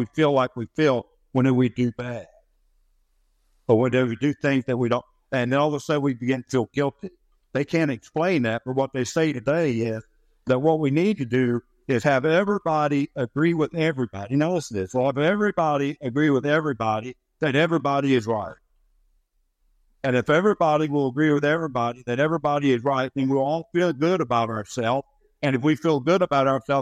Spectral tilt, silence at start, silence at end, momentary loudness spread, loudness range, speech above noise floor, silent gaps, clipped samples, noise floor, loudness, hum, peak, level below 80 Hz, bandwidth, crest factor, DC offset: -6.5 dB/octave; 0 s; 0 s; 8 LU; 3 LU; 46 dB; none; under 0.1%; -68 dBFS; -23 LUFS; none; -6 dBFS; -60 dBFS; 11 kHz; 16 dB; under 0.1%